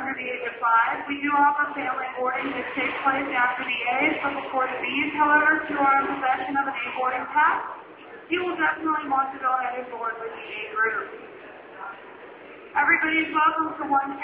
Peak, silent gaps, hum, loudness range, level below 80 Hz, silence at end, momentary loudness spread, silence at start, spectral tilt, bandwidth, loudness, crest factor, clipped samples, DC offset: -8 dBFS; none; none; 5 LU; -64 dBFS; 0 s; 18 LU; 0 s; -0.5 dB/octave; 4 kHz; -24 LUFS; 16 dB; under 0.1%; under 0.1%